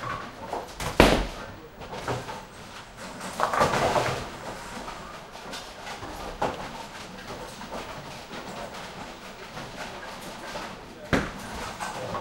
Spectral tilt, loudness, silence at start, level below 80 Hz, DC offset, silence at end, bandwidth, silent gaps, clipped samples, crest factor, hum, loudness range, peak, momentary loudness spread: -4.5 dB/octave; -31 LUFS; 0 s; -42 dBFS; under 0.1%; 0 s; 16 kHz; none; under 0.1%; 30 dB; none; 10 LU; 0 dBFS; 17 LU